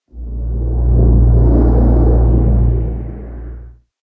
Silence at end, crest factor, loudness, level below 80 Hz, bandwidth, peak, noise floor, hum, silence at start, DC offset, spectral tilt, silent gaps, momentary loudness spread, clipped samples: 0.3 s; 12 dB; -13 LUFS; -14 dBFS; 1.8 kHz; 0 dBFS; -34 dBFS; none; 0.15 s; under 0.1%; -14 dB/octave; none; 18 LU; under 0.1%